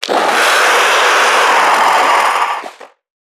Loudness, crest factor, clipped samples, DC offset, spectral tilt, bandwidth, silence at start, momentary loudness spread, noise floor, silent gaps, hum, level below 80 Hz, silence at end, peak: -10 LUFS; 12 dB; under 0.1%; under 0.1%; 0.5 dB/octave; 19.5 kHz; 0 s; 5 LU; -33 dBFS; none; none; -74 dBFS; 0.45 s; 0 dBFS